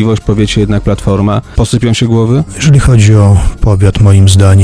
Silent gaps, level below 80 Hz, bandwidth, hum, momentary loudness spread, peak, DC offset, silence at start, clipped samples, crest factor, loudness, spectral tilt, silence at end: none; -18 dBFS; 11 kHz; none; 6 LU; 0 dBFS; 0.8%; 0 s; 2%; 6 dB; -8 LUFS; -6.5 dB/octave; 0 s